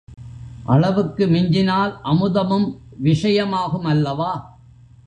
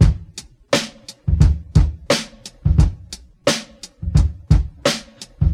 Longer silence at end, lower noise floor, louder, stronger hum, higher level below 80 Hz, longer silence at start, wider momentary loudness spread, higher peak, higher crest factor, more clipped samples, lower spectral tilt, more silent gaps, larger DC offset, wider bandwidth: first, 0.6 s vs 0 s; first, -46 dBFS vs -39 dBFS; about the same, -19 LUFS vs -20 LUFS; neither; second, -46 dBFS vs -22 dBFS; about the same, 0.1 s vs 0 s; second, 12 LU vs 18 LU; second, -4 dBFS vs 0 dBFS; about the same, 16 dB vs 18 dB; neither; first, -8 dB/octave vs -5.5 dB/octave; neither; neither; second, 9.2 kHz vs 14.5 kHz